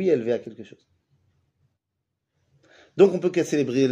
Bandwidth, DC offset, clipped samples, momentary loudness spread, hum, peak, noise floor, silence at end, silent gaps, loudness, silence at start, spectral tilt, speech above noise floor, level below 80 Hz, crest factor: 10 kHz; under 0.1%; under 0.1%; 21 LU; none; -4 dBFS; -81 dBFS; 0 s; none; -22 LUFS; 0 s; -6.5 dB/octave; 59 dB; -72 dBFS; 22 dB